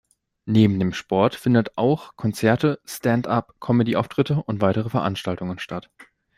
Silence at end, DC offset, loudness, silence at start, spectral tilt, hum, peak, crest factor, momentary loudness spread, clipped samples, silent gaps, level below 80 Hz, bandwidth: 0.35 s; under 0.1%; -22 LUFS; 0.45 s; -7 dB/octave; none; -4 dBFS; 18 dB; 10 LU; under 0.1%; none; -56 dBFS; 16 kHz